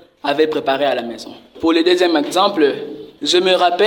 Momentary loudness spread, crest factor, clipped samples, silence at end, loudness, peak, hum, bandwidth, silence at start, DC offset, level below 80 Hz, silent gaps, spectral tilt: 15 LU; 14 dB; under 0.1%; 0 s; -16 LUFS; -2 dBFS; none; 17 kHz; 0.25 s; under 0.1%; -60 dBFS; none; -3.5 dB/octave